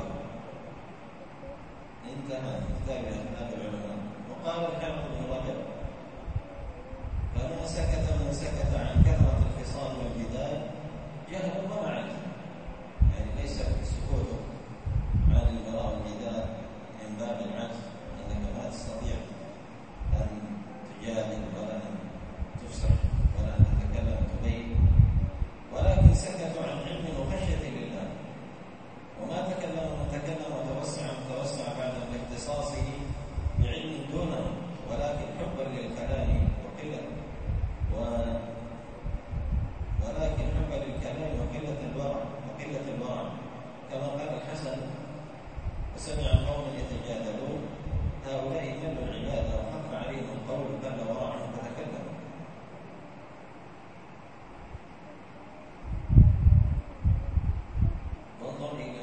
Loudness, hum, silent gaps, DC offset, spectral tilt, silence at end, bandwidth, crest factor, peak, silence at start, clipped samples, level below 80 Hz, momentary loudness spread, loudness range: -32 LUFS; none; none; 0.3%; -7 dB/octave; 0 s; 8.8 kHz; 26 dB; -4 dBFS; 0 s; under 0.1%; -34 dBFS; 17 LU; 10 LU